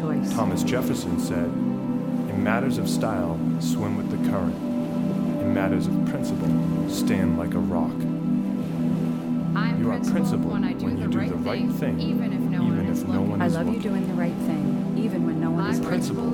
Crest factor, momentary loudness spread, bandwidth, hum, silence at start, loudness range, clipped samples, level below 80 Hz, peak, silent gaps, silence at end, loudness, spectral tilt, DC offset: 16 dB; 3 LU; 17 kHz; none; 0 s; 1 LU; under 0.1%; -50 dBFS; -8 dBFS; none; 0 s; -24 LUFS; -7 dB/octave; under 0.1%